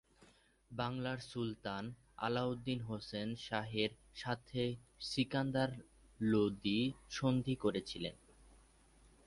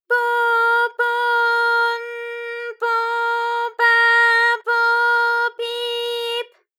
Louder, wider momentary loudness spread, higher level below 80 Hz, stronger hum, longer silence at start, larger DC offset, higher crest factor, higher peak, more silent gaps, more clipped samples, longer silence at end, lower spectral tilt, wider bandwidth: second, -39 LUFS vs -18 LUFS; second, 9 LU vs 13 LU; first, -64 dBFS vs under -90 dBFS; neither; about the same, 0.2 s vs 0.1 s; neither; about the same, 18 dB vs 14 dB; second, -22 dBFS vs -6 dBFS; neither; neither; first, 0.7 s vs 0.35 s; first, -6 dB/octave vs 3.5 dB/octave; second, 11.5 kHz vs 17 kHz